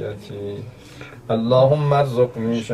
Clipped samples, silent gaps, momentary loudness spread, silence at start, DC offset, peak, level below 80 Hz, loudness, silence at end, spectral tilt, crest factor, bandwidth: under 0.1%; none; 22 LU; 0 s; under 0.1%; -4 dBFS; -52 dBFS; -18 LUFS; 0 s; -8 dB/octave; 16 dB; 12.5 kHz